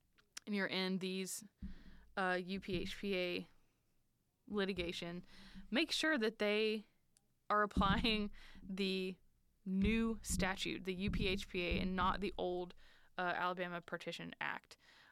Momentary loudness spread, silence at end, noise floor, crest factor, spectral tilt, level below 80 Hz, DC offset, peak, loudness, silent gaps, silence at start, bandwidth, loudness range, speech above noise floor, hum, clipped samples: 16 LU; 0.4 s; -79 dBFS; 16 dB; -4.5 dB/octave; -54 dBFS; under 0.1%; -24 dBFS; -39 LUFS; none; 0.45 s; 15.5 kHz; 5 LU; 40 dB; none; under 0.1%